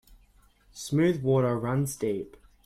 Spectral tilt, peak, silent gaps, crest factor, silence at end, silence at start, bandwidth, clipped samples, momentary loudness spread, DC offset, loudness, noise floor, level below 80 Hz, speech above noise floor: -6.5 dB/octave; -12 dBFS; none; 16 dB; 0.4 s; 0.1 s; 16 kHz; under 0.1%; 13 LU; under 0.1%; -27 LUFS; -61 dBFS; -58 dBFS; 34 dB